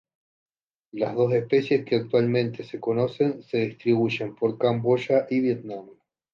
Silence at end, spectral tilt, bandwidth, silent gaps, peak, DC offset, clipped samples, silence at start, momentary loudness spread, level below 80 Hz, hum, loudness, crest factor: 0.45 s; -8 dB/octave; 7.2 kHz; none; -8 dBFS; under 0.1%; under 0.1%; 0.95 s; 8 LU; -68 dBFS; none; -24 LUFS; 16 dB